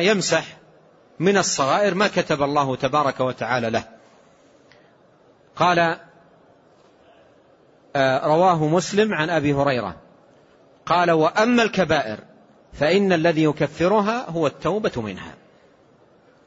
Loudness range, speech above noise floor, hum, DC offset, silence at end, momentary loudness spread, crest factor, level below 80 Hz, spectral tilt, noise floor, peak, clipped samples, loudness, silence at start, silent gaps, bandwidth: 6 LU; 35 dB; none; under 0.1%; 1.15 s; 10 LU; 18 dB; -56 dBFS; -4.5 dB/octave; -55 dBFS; -4 dBFS; under 0.1%; -20 LUFS; 0 s; none; 8 kHz